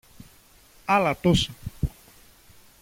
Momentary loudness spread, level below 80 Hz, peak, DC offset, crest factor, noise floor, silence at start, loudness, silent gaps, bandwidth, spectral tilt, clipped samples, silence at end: 11 LU; -42 dBFS; -8 dBFS; under 0.1%; 20 dB; -54 dBFS; 0.9 s; -24 LUFS; none; 16.5 kHz; -5.5 dB/octave; under 0.1%; 0.95 s